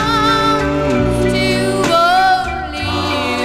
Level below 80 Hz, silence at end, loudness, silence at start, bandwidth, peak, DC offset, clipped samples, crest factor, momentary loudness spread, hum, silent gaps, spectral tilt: -30 dBFS; 0 s; -14 LUFS; 0 s; 16 kHz; -2 dBFS; 0.2%; under 0.1%; 12 dB; 7 LU; none; none; -5 dB/octave